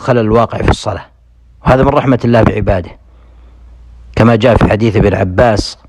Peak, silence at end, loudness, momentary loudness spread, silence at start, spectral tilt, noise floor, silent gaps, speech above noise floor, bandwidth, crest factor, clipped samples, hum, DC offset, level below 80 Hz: 0 dBFS; 0.15 s; -11 LUFS; 10 LU; 0 s; -7 dB/octave; -43 dBFS; none; 33 dB; 11 kHz; 12 dB; 0.5%; none; under 0.1%; -26 dBFS